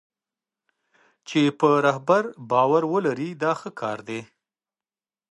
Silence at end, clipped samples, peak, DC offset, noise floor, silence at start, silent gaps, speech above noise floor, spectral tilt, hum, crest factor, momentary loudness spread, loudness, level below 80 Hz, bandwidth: 1.1 s; under 0.1%; -4 dBFS; under 0.1%; under -90 dBFS; 1.3 s; none; over 68 dB; -6 dB/octave; none; 20 dB; 11 LU; -23 LUFS; -74 dBFS; 11 kHz